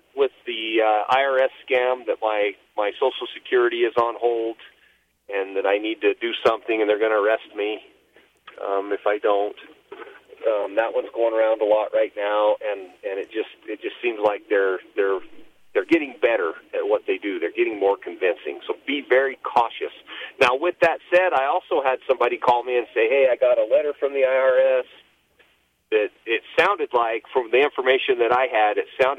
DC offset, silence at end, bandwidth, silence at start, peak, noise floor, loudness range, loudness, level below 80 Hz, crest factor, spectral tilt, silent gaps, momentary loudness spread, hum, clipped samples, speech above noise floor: under 0.1%; 0 s; 8.8 kHz; 0.15 s; -6 dBFS; -62 dBFS; 4 LU; -22 LUFS; -68 dBFS; 16 dB; -4.5 dB/octave; none; 11 LU; none; under 0.1%; 41 dB